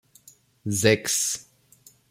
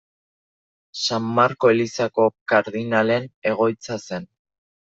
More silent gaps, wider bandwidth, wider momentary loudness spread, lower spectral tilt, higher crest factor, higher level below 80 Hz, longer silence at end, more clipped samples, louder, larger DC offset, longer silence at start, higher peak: second, none vs 2.41-2.46 s, 3.34-3.42 s; first, 16.5 kHz vs 8 kHz; about the same, 13 LU vs 12 LU; second, -3 dB/octave vs -5 dB/octave; first, 24 dB vs 18 dB; about the same, -62 dBFS vs -66 dBFS; about the same, 0.7 s vs 0.7 s; neither; about the same, -23 LUFS vs -21 LUFS; neither; second, 0.65 s vs 0.95 s; about the same, -4 dBFS vs -4 dBFS